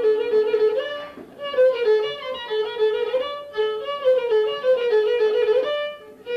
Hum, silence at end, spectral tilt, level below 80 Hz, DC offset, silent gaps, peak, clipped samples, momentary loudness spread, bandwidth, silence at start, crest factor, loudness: none; 0 s; -3.5 dB/octave; -66 dBFS; under 0.1%; none; -10 dBFS; under 0.1%; 11 LU; 6.2 kHz; 0 s; 12 dB; -21 LUFS